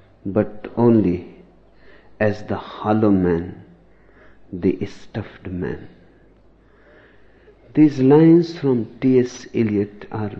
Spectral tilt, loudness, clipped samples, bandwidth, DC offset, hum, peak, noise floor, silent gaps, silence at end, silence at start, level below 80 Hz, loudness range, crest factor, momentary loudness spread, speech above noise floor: -8.5 dB/octave; -19 LUFS; under 0.1%; 7 kHz; under 0.1%; none; -2 dBFS; -52 dBFS; none; 0 s; 0.25 s; -52 dBFS; 12 LU; 18 dB; 16 LU; 34 dB